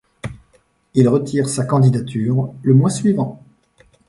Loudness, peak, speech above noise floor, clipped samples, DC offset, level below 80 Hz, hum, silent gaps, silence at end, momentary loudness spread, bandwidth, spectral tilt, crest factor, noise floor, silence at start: -17 LUFS; 0 dBFS; 42 dB; under 0.1%; under 0.1%; -52 dBFS; none; none; 0.75 s; 12 LU; 11.5 kHz; -7.5 dB/octave; 16 dB; -58 dBFS; 0.25 s